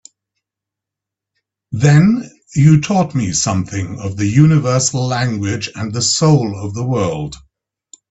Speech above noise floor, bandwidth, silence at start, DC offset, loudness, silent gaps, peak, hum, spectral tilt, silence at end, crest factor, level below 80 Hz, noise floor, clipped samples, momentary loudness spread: 70 dB; 8.4 kHz; 1.7 s; under 0.1%; -15 LUFS; none; 0 dBFS; none; -5.5 dB/octave; 0.75 s; 16 dB; -46 dBFS; -84 dBFS; under 0.1%; 12 LU